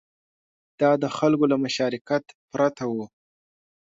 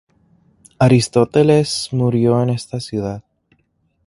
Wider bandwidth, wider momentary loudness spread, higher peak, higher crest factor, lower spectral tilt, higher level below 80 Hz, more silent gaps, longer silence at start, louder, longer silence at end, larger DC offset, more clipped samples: second, 7.8 kHz vs 11.5 kHz; about the same, 10 LU vs 11 LU; second, -8 dBFS vs 0 dBFS; about the same, 18 dB vs 18 dB; about the same, -6 dB/octave vs -6.5 dB/octave; second, -70 dBFS vs -50 dBFS; first, 2.01-2.05 s, 2.35-2.48 s vs none; about the same, 0.8 s vs 0.8 s; second, -24 LUFS vs -16 LUFS; about the same, 0.9 s vs 0.85 s; neither; neither